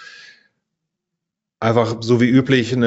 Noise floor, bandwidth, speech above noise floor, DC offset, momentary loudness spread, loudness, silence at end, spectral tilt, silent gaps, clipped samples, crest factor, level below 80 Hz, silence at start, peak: -82 dBFS; 8 kHz; 66 dB; under 0.1%; 5 LU; -17 LUFS; 0 s; -5.5 dB/octave; none; under 0.1%; 18 dB; -56 dBFS; 0 s; -2 dBFS